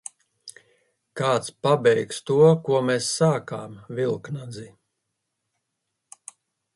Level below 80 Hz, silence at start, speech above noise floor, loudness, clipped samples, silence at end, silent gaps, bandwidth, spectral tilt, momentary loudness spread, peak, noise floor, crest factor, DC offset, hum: -66 dBFS; 0.45 s; 58 dB; -22 LUFS; under 0.1%; 2.1 s; none; 11.5 kHz; -5.5 dB/octave; 26 LU; -6 dBFS; -80 dBFS; 20 dB; under 0.1%; none